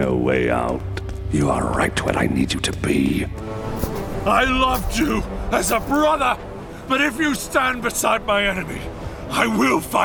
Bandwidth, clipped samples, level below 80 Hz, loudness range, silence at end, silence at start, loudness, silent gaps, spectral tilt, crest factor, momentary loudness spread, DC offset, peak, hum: over 20 kHz; under 0.1%; -34 dBFS; 2 LU; 0 s; 0 s; -20 LUFS; none; -4.5 dB/octave; 18 dB; 10 LU; under 0.1%; -2 dBFS; none